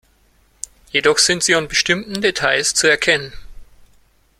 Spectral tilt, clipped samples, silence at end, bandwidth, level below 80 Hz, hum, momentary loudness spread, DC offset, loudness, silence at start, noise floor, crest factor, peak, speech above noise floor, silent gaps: -1.5 dB/octave; under 0.1%; 0.75 s; 16 kHz; -46 dBFS; none; 20 LU; under 0.1%; -15 LUFS; 0.95 s; -56 dBFS; 18 dB; 0 dBFS; 39 dB; none